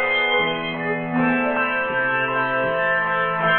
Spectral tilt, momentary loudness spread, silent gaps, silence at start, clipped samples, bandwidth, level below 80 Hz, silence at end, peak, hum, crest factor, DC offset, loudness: -9 dB/octave; 5 LU; none; 0 s; under 0.1%; 4.3 kHz; -56 dBFS; 0 s; -8 dBFS; none; 14 dB; under 0.1%; -20 LUFS